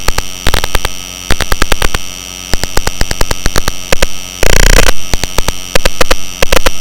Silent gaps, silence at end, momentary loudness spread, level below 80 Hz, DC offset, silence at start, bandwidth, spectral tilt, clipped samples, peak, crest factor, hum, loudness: none; 0 s; 8 LU; -14 dBFS; under 0.1%; 0 s; 17.5 kHz; -2.5 dB/octave; 6%; 0 dBFS; 8 dB; none; -14 LUFS